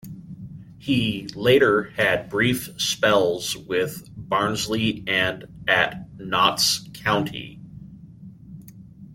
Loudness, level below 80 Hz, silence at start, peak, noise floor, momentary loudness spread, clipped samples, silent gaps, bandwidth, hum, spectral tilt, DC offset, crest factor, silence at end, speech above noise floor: -22 LUFS; -52 dBFS; 0.05 s; -2 dBFS; -44 dBFS; 22 LU; under 0.1%; none; 16.5 kHz; none; -3.5 dB/octave; under 0.1%; 22 dB; 0 s; 21 dB